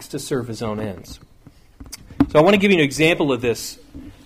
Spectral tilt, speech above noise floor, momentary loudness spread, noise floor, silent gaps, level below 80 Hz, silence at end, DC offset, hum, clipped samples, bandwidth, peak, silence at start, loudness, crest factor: -5 dB/octave; 26 dB; 24 LU; -45 dBFS; none; -44 dBFS; 0.15 s; under 0.1%; none; under 0.1%; 15.5 kHz; -4 dBFS; 0 s; -18 LUFS; 16 dB